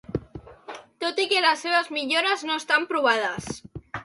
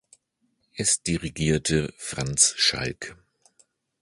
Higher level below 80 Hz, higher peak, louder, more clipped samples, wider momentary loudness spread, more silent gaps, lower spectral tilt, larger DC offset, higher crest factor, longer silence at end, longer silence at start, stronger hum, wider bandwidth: second, -54 dBFS vs -48 dBFS; about the same, -6 dBFS vs -6 dBFS; about the same, -23 LUFS vs -23 LUFS; neither; first, 19 LU vs 16 LU; neither; about the same, -3 dB/octave vs -2.5 dB/octave; neither; about the same, 20 dB vs 22 dB; second, 0 s vs 0.9 s; second, 0.1 s vs 0.75 s; neither; about the same, 11.5 kHz vs 11.5 kHz